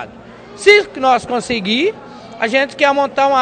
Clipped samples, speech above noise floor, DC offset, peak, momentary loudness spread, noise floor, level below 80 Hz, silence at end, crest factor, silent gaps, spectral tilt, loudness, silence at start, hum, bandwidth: 0.2%; 23 dB; under 0.1%; 0 dBFS; 14 LU; -36 dBFS; -52 dBFS; 0 s; 16 dB; none; -3.5 dB/octave; -14 LUFS; 0 s; none; 10.5 kHz